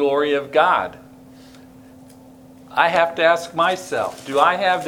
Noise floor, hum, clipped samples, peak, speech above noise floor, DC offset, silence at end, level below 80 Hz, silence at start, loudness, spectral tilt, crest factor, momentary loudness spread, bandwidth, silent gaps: -44 dBFS; none; under 0.1%; 0 dBFS; 26 dB; under 0.1%; 0 s; -60 dBFS; 0 s; -18 LUFS; -3.5 dB/octave; 20 dB; 8 LU; 18.5 kHz; none